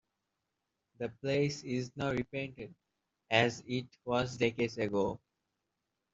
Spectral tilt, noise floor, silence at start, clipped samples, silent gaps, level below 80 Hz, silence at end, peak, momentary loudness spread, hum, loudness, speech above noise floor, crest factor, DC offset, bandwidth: -5.5 dB/octave; -86 dBFS; 1 s; under 0.1%; none; -64 dBFS; 0.95 s; -12 dBFS; 13 LU; none; -34 LUFS; 52 dB; 24 dB; under 0.1%; 8 kHz